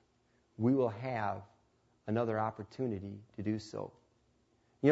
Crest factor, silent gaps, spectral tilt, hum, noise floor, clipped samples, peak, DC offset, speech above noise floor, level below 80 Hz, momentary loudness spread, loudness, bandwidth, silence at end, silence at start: 22 dB; none; -7.5 dB/octave; none; -73 dBFS; under 0.1%; -14 dBFS; under 0.1%; 38 dB; -72 dBFS; 14 LU; -36 LUFS; 7.6 kHz; 0 s; 0.6 s